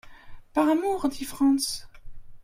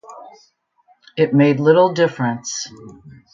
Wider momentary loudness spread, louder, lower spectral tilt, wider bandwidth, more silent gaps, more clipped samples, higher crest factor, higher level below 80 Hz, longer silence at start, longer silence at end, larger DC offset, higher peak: second, 8 LU vs 15 LU; second, -25 LUFS vs -16 LUFS; second, -3 dB/octave vs -5.5 dB/octave; first, 16 kHz vs 7.6 kHz; neither; neither; about the same, 16 dB vs 16 dB; first, -48 dBFS vs -62 dBFS; about the same, 0.05 s vs 0.1 s; second, 0 s vs 0.25 s; neither; second, -10 dBFS vs -2 dBFS